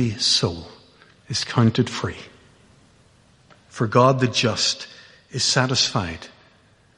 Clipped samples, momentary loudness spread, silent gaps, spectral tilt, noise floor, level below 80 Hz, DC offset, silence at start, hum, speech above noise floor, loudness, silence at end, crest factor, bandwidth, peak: under 0.1%; 18 LU; none; -4 dB/octave; -56 dBFS; -54 dBFS; under 0.1%; 0 s; none; 35 dB; -20 LUFS; 0.7 s; 22 dB; 11.5 kHz; -2 dBFS